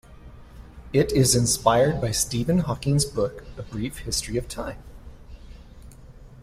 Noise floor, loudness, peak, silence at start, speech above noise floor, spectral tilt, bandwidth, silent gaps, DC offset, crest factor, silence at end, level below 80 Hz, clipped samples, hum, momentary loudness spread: -45 dBFS; -23 LUFS; -4 dBFS; 0.1 s; 22 dB; -4.5 dB/octave; 16 kHz; none; under 0.1%; 22 dB; 0 s; -42 dBFS; under 0.1%; none; 15 LU